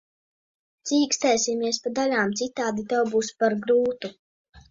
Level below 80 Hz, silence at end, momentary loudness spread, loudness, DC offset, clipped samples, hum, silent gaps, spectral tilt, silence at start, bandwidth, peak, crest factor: -64 dBFS; 0.1 s; 7 LU; -24 LUFS; under 0.1%; under 0.1%; none; 4.19-4.45 s; -3 dB/octave; 0.85 s; 7.8 kHz; -8 dBFS; 18 dB